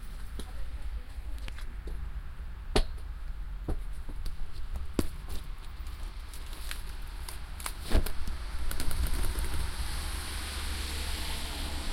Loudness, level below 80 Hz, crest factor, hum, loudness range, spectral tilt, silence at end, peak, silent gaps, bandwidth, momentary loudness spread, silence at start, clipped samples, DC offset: -38 LUFS; -34 dBFS; 22 dB; none; 5 LU; -4 dB/octave; 0 s; -10 dBFS; none; 16 kHz; 11 LU; 0 s; under 0.1%; under 0.1%